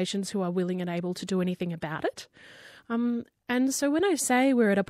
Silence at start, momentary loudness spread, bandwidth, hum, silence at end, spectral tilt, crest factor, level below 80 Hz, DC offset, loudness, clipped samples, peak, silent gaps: 0 s; 11 LU; 16 kHz; none; 0.05 s; -5 dB/octave; 14 dB; -70 dBFS; under 0.1%; -28 LUFS; under 0.1%; -14 dBFS; none